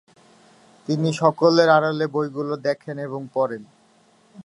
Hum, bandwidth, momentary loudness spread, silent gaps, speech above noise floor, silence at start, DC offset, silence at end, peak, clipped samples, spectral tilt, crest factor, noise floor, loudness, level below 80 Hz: none; 11 kHz; 14 LU; none; 37 dB; 0.9 s; under 0.1%; 0.05 s; -2 dBFS; under 0.1%; -6 dB/octave; 20 dB; -57 dBFS; -21 LUFS; -74 dBFS